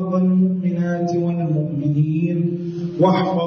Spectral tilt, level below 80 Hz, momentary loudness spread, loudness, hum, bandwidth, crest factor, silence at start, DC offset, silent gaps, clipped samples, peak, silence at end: -9 dB/octave; -60 dBFS; 5 LU; -20 LUFS; none; 6.6 kHz; 14 dB; 0 s; under 0.1%; none; under 0.1%; -4 dBFS; 0 s